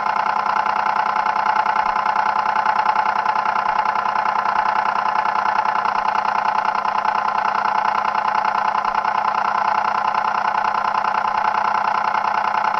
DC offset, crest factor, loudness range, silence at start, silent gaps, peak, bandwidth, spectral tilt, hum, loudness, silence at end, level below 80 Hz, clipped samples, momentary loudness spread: under 0.1%; 16 dB; 1 LU; 0 s; none; -4 dBFS; 7.4 kHz; -3 dB/octave; 50 Hz at -50 dBFS; -19 LUFS; 0 s; -58 dBFS; under 0.1%; 1 LU